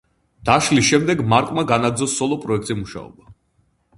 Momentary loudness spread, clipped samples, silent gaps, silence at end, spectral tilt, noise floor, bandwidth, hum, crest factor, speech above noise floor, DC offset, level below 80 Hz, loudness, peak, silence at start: 12 LU; under 0.1%; none; 0.65 s; -4.5 dB/octave; -64 dBFS; 11.5 kHz; none; 20 dB; 45 dB; under 0.1%; -48 dBFS; -18 LUFS; 0 dBFS; 0.45 s